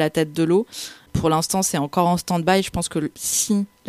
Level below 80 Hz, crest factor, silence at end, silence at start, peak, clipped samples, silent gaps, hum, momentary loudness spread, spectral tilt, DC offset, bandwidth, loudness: -46 dBFS; 18 dB; 0 s; 0 s; -4 dBFS; under 0.1%; none; none; 6 LU; -4.5 dB/octave; under 0.1%; 15.5 kHz; -21 LUFS